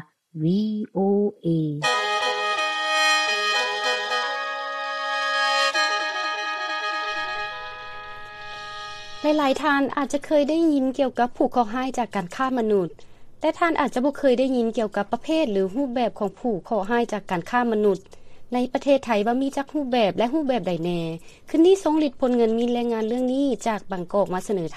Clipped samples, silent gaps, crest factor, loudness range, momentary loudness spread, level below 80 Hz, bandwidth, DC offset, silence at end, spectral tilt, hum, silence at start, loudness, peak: under 0.1%; none; 16 dB; 3 LU; 9 LU; -52 dBFS; 13.5 kHz; under 0.1%; 0 s; -4.5 dB/octave; none; 0 s; -23 LUFS; -8 dBFS